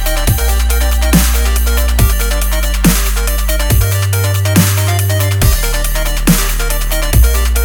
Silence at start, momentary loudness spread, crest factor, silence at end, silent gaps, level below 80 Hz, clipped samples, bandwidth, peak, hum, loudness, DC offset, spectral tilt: 0 s; 5 LU; 10 dB; 0 s; none; -14 dBFS; 0.1%; over 20 kHz; 0 dBFS; none; -13 LUFS; under 0.1%; -4.5 dB/octave